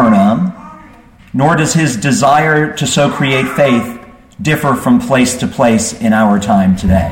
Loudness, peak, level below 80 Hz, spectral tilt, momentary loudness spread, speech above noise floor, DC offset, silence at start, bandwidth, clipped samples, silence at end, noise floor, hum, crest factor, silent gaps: -12 LUFS; 0 dBFS; -34 dBFS; -5 dB/octave; 7 LU; 28 dB; 0.1%; 0 s; 16.5 kHz; under 0.1%; 0 s; -39 dBFS; none; 12 dB; none